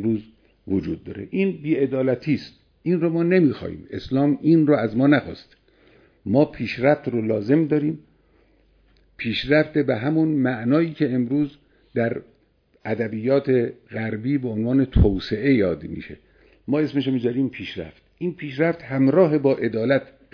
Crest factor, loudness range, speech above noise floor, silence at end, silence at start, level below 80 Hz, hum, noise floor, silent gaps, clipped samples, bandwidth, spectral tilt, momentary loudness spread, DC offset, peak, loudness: 18 dB; 4 LU; 41 dB; 0.3 s; 0 s; -40 dBFS; none; -62 dBFS; none; under 0.1%; 5.4 kHz; -9.5 dB/octave; 14 LU; under 0.1%; -4 dBFS; -22 LUFS